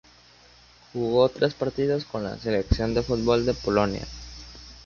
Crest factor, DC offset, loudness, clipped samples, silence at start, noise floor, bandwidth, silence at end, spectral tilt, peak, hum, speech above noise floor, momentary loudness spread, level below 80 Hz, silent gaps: 20 dB; under 0.1%; -25 LUFS; under 0.1%; 0.95 s; -54 dBFS; 7 kHz; 0.05 s; -6.5 dB/octave; -6 dBFS; none; 29 dB; 17 LU; -38 dBFS; none